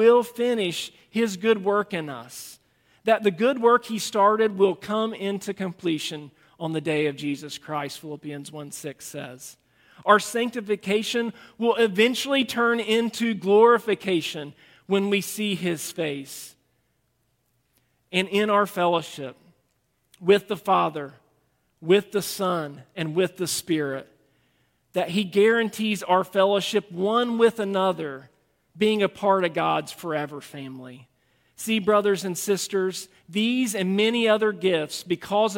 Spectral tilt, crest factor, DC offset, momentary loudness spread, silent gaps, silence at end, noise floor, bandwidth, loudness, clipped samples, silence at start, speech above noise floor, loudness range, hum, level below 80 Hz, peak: -4.5 dB/octave; 22 dB; under 0.1%; 16 LU; none; 0 s; -71 dBFS; 17 kHz; -24 LUFS; under 0.1%; 0 s; 47 dB; 7 LU; none; -70 dBFS; -2 dBFS